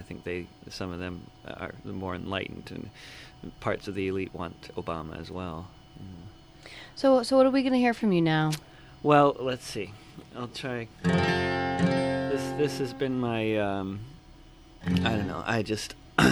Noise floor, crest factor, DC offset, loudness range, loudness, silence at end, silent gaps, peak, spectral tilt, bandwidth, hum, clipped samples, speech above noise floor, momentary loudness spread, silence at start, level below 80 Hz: -51 dBFS; 24 dB; under 0.1%; 12 LU; -28 LUFS; 0 s; none; -4 dBFS; -6 dB/octave; 19.5 kHz; none; under 0.1%; 23 dB; 20 LU; 0 s; -54 dBFS